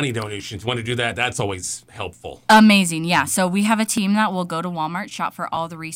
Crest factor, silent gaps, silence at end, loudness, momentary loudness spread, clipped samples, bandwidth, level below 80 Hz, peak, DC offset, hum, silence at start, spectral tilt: 16 dB; none; 0 s; -19 LUFS; 15 LU; under 0.1%; 16.5 kHz; -54 dBFS; -4 dBFS; under 0.1%; none; 0 s; -4 dB/octave